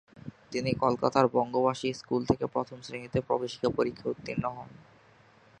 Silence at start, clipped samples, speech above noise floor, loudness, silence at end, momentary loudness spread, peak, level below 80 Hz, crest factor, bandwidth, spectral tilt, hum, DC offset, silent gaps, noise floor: 0.15 s; under 0.1%; 30 dB; -30 LUFS; 0.85 s; 14 LU; -6 dBFS; -58 dBFS; 24 dB; 9.8 kHz; -6.5 dB/octave; none; under 0.1%; none; -59 dBFS